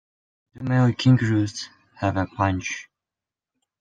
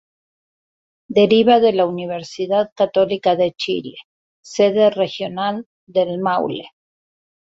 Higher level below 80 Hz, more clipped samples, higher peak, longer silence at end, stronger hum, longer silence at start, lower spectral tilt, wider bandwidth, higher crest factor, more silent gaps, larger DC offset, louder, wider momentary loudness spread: about the same, -58 dBFS vs -62 dBFS; neither; second, -6 dBFS vs -2 dBFS; first, 1 s vs 0.8 s; neither; second, 0.55 s vs 1.1 s; about the same, -6.5 dB/octave vs -5.5 dB/octave; about the same, 7.8 kHz vs 7.8 kHz; about the same, 18 dB vs 18 dB; second, none vs 2.72-2.76 s, 4.04-4.43 s, 5.66-5.87 s; neither; second, -22 LUFS vs -18 LUFS; first, 16 LU vs 13 LU